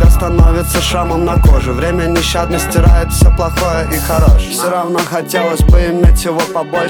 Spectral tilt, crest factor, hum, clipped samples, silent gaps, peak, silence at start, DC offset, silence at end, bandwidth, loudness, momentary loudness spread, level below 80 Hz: -5.5 dB/octave; 10 dB; none; under 0.1%; none; 0 dBFS; 0 s; under 0.1%; 0 s; 18.5 kHz; -12 LUFS; 5 LU; -12 dBFS